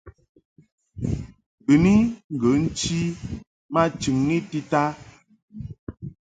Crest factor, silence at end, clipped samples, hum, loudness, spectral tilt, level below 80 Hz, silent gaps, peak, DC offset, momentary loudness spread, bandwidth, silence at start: 20 dB; 0.25 s; under 0.1%; none; -23 LUFS; -6 dB/octave; -44 dBFS; 0.29-0.35 s, 0.45-0.56 s, 0.72-0.78 s, 1.46-1.58 s, 2.24-2.30 s, 3.47-3.69 s, 5.42-5.48 s, 5.79-5.87 s; -4 dBFS; under 0.1%; 20 LU; 9.4 kHz; 0.05 s